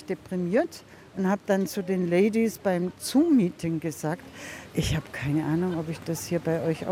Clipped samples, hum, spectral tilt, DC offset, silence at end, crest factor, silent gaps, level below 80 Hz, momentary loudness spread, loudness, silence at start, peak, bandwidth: under 0.1%; none; -6 dB/octave; under 0.1%; 0 s; 16 dB; none; -52 dBFS; 10 LU; -27 LUFS; 0 s; -12 dBFS; 16.5 kHz